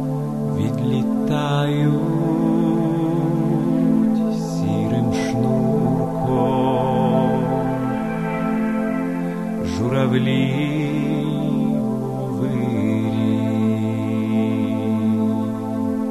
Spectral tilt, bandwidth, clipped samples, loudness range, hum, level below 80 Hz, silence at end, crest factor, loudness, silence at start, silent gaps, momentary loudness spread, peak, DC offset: -8 dB/octave; 13 kHz; under 0.1%; 2 LU; none; -48 dBFS; 0 s; 14 dB; -20 LUFS; 0 s; none; 5 LU; -6 dBFS; 0.4%